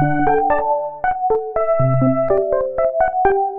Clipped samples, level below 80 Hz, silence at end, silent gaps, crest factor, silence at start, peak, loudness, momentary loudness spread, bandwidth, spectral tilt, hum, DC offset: under 0.1%; -38 dBFS; 0 s; none; 14 dB; 0 s; -2 dBFS; -17 LUFS; 4 LU; 3.7 kHz; -12 dB/octave; none; under 0.1%